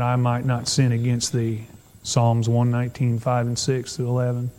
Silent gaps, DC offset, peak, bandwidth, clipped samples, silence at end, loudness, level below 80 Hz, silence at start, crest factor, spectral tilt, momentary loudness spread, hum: none; under 0.1%; -6 dBFS; 12.5 kHz; under 0.1%; 0.05 s; -22 LUFS; -54 dBFS; 0 s; 16 dB; -5.5 dB/octave; 5 LU; none